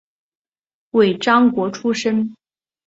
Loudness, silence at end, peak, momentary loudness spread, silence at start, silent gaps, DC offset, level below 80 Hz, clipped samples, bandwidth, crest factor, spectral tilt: -17 LUFS; 0.55 s; -2 dBFS; 8 LU; 0.95 s; none; under 0.1%; -64 dBFS; under 0.1%; 8 kHz; 18 dB; -5.5 dB/octave